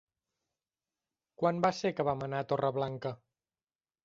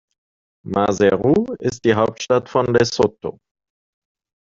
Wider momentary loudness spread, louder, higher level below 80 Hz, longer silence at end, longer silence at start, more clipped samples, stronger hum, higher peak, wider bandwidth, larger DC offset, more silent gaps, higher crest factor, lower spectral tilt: first, 11 LU vs 8 LU; second, -33 LUFS vs -18 LUFS; second, -70 dBFS vs -52 dBFS; second, 0.9 s vs 1.15 s; first, 1.4 s vs 0.65 s; neither; neither; second, -14 dBFS vs -2 dBFS; about the same, 7.8 kHz vs 7.8 kHz; neither; neither; about the same, 22 dB vs 18 dB; about the same, -6.5 dB/octave vs -5.5 dB/octave